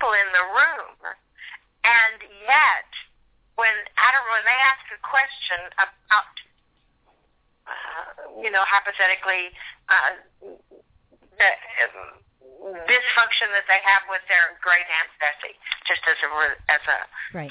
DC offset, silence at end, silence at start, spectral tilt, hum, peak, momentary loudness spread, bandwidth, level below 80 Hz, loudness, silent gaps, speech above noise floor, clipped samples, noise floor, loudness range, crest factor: under 0.1%; 0 s; 0 s; 2.5 dB/octave; none; -6 dBFS; 20 LU; 4 kHz; -62 dBFS; -19 LUFS; none; 43 dB; under 0.1%; -65 dBFS; 5 LU; 16 dB